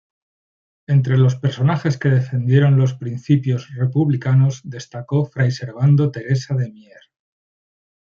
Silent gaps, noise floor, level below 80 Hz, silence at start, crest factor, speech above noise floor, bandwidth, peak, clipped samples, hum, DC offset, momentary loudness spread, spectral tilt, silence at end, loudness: none; under -90 dBFS; -58 dBFS; 0.9 s; 16 dB; over 73 dB; 7.2 kHz; -2 dBFS; under 0.1%; none; under 0.1%; 8 LU; -8 dB/octave; 1.4 s; -18 LUFS